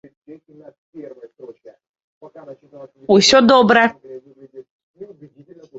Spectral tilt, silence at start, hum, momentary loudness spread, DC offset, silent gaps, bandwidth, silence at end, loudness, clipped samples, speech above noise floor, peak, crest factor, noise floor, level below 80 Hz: -3.5 dB/octave; 0.3 s; none; 28 LU; under 0.1%; 0.78-0.93 s, 1.89-1.94 s, 2.04-2.21 s, 4.70-4.94 s; 8 kHz; 0.75 s; -12 LUFS; under 0.1%; 32 dB; 0 dBFS; 18 dB; -45 dBFS; -58 dBFS